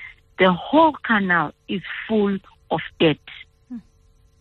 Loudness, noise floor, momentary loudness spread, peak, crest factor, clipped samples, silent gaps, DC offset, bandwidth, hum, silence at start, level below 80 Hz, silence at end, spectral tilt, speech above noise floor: -20 LUFS; -56 dBFS; 22 LU; -4 dBFS; 18 dB; under 0.1%; none; under 0.1%; 4.4 kHz; none; 0 s; -54 dBFS; 0.6 s; -8.5 dB/octave; 36 dB